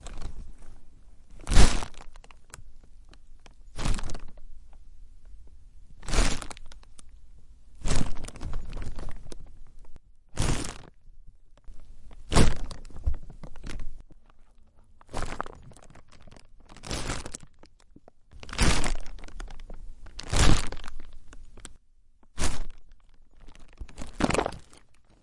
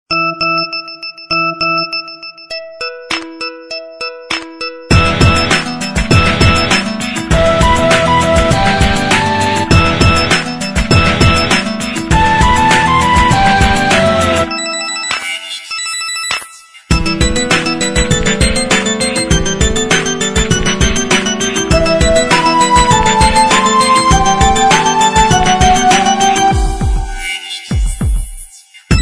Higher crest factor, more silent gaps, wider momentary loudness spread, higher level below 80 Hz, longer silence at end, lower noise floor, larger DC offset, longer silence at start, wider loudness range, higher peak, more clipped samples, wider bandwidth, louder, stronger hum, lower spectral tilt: first, 24 dB vs 12 dB; neither; first, 28 LU vs 11 LU; second, -32 dBFS vs -20 dBFS; first, 0.6 s vs 0 s; first, -55 dBFS vs -35 dBFS; second, under 0.1% vs 1%; about the same, 0.05 s vs 0.1 s; first, 11 LU vs 7 LU; about the same, -2 dBFS vs 0 dBFS; neither; second, 11.5 kHz vs 13.5 kHz; second, -31 LUFS vs -11 LUFS; neither; about the same, -4 dB/octave vs -3.5 dB/octave